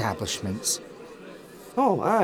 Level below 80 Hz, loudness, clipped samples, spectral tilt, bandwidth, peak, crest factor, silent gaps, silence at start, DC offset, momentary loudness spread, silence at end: -58 dBFS; -26 LUFS; under 0.1%; -3.5 dB/octave; 19.5 kHz; -8 dBFS; 18 dB; none; 0 s; under 0.1%; 21 LU; 0 s